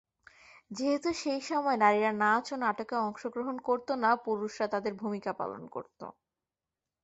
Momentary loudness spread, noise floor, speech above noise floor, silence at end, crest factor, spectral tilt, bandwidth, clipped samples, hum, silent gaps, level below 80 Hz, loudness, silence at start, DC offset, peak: 16 LU; under -90 dBFS; over 59 dB; 0.9 s; 22 dB; -4.5 dB/octave; 8.2 kHz; under 0.1%; none; none; -72 dBFS; -31 LUFS; 0.7 s; under 0.1%; -10 dBFS